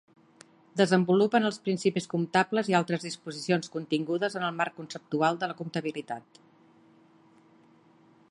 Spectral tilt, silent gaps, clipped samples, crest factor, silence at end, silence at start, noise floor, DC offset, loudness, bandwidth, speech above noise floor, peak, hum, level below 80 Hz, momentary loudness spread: -5.5 dB/octave; none; under 0.1%; 20 dB; 2.1 s; 0.75 s; -60 dBFS; under 0.1%; -28 LUFS; 11.5 kHz; 32 dB; -10 dBFS; none; -76 dBFS; 13 LU